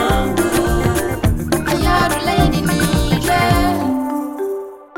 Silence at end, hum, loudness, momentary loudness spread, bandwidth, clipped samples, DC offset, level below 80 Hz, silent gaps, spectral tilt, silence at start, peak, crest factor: 0 s; none; -17 LUFS; 7 LU; 17 kHz; under 0.1%; 1%; -26 dBFS; none; -5.5 dB/octave; 0 s; -2 dBFS; 16 dB